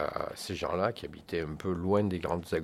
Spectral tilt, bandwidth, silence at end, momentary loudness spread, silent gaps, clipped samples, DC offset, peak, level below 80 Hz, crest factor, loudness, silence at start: -6 dB/octave; 16 kHz; 0 s; 8 LU; none; under 0.1%; under 0.1%; -14 dBFS; -54 dBFS; 18 dB; -33 LUFS; 0 s